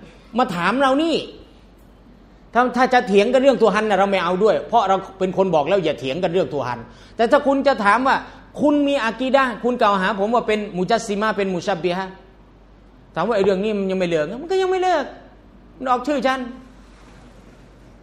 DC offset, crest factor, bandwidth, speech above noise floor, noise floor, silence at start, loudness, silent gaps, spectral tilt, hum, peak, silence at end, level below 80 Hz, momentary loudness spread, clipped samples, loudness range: under 0.1%; 18 dB; 12 kHz; 29 dB; -47 dBFS; 0 s; -19 LUFS; none; -5.5 dB/octave; none; -2 dBFS; 0.75 s; -50 dBFS; 9 LU; under 0.1%; 5 LU